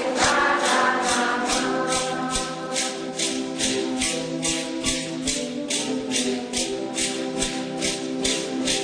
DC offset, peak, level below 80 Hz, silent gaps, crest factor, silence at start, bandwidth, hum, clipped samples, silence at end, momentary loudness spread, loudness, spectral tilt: under 0.1%; -6 dBFS; -48 dBFS; none; 18 dB; 0 s; 10.5 kHz; none; under 0.1%; 0 s; 6 LU; -23 LUFS; -2 dB/octave